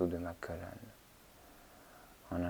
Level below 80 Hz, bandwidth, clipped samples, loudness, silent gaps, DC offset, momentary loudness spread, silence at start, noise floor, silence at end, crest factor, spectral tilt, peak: -64 dBFS; over 20 kHz; under 0.1%; -43 LUFS; none; under 0.1%; 17 LU; 0 s; -61 dBFS; 0 s; 22 dB; -7 dB/octave; -20 dBFS